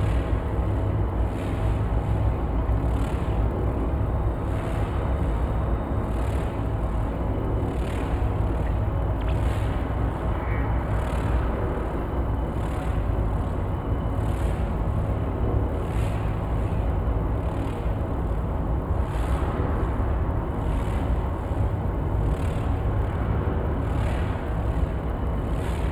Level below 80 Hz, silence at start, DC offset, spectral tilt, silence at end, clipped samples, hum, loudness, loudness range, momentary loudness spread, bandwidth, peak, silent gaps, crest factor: -28 dBFS; 0 s; under 0.1%; -8.5 dB/octave; 0 s; under 0.1%; none; -27 LUFS; 1 LU; 2 LU; 11.5 kHz; -10 dBFS; none; 14 dB